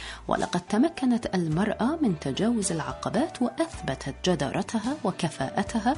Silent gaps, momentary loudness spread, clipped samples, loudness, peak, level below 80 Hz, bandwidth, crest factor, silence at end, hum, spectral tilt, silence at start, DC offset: none; 5 LU; under 0.1%; -27 LUFS; -8 dBFS; -50 dBFS; 11 kHz; 18 dB; 0 s; none; -5.5 dB/octave; 0 s; under 0.1%